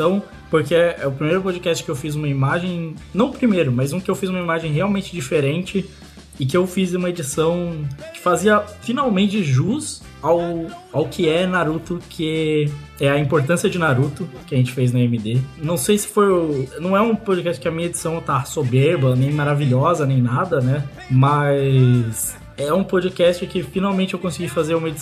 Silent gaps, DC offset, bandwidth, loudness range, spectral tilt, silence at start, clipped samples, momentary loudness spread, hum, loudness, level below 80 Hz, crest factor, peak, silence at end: none; under 0.1%; 14 kHz; 3 LU; -6 dB/octave; 0 s; under 0.1%; 8 LU; none; -19 LUFS; -48 dBFS; 16 dB; -4 dBFS; 0 s